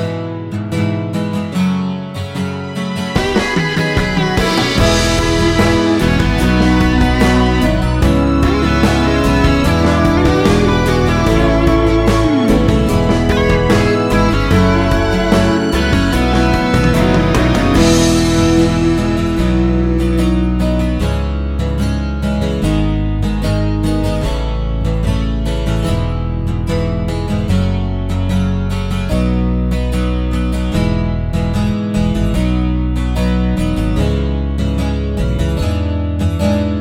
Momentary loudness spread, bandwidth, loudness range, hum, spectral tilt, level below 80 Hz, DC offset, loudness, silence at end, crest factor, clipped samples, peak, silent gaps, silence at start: 7 LU; 16 kHz; 5 LU; none; -6 dB/octave; -20 dBFS; under 0.1%; -14 LUFS; 0 s; 14 dB; under 0.1%; 0 dBFS; none; 0 s